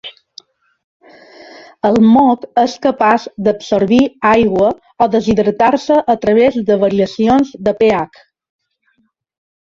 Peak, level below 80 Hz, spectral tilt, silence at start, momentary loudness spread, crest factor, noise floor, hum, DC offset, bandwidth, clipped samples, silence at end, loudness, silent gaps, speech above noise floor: 0 dBFS; -46 dBFS; -6.5 dB/octave; 0.05 s; 6 LU; 14 dB; -62 dBFS; none; under 0.1%; 7.4 kHz; under 0.1%; 1.55 s; -13 LUFS; 0.84-1.00 s; 49 dB